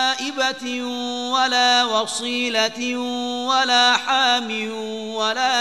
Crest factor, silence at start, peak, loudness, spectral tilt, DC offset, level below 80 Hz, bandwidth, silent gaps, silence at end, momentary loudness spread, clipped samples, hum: 18 dB; 0 s; -2 dBFS; -19 LUFS; -1 dB/octave; 0.3%; -72 dBFS; 12.5 kHz; none; 0 s; 10 LU; under 0.1%; none